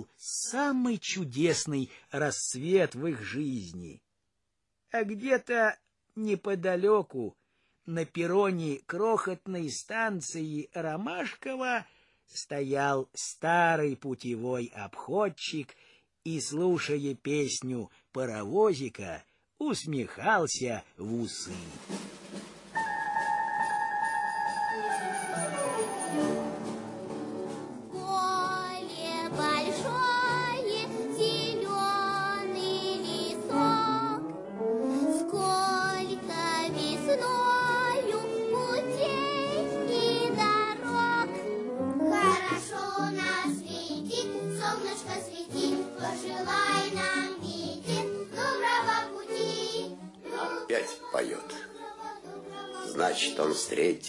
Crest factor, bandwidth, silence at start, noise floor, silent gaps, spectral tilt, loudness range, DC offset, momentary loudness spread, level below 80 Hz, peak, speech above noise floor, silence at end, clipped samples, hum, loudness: 18 dB; 11.5 kHz; 0 s; -82 dBFS; none; -4 dB/octave; 5 LU; under 0.1%; 12 LU; -70 dBFS; -12 dBFS; 52 dB; 0 s; under 0.1%; none; -30 LUFS